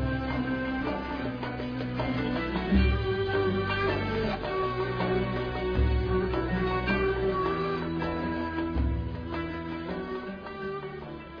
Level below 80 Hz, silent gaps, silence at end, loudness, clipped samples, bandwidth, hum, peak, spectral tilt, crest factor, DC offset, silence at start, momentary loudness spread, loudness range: -36 dBFS; none; 0 s; -30 LUFS; under 0.1%; 5.2 kHz; none; -12 dBFS; -8.5 dB/octave; 16 dB; under 0.1%; 0 s; 8 LU; 4 LU